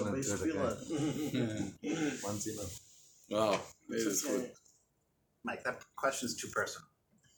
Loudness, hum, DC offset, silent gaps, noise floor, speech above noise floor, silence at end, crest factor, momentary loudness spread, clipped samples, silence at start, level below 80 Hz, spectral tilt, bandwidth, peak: -37 LUFS; none; under 0.1%; none; -77 dBFS; 41 dB; 0.5 s; 20 dB; 10 LU; under 0.1%; 0 s; -68 dBFS; -4 dB/octave; over 20 kHz; -16 dBFS